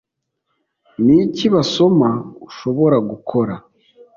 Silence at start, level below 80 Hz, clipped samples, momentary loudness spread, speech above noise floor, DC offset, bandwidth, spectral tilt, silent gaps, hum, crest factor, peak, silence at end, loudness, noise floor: 1 s; -54 dBFS; under 0.1%; 14 LU; 59 dB; under 0.1%; 7.4 kHz; -7 dB/octave; none; none; 14 dB; -2 dBFS; 0.6 s; -16 LUFS; -74 dBFS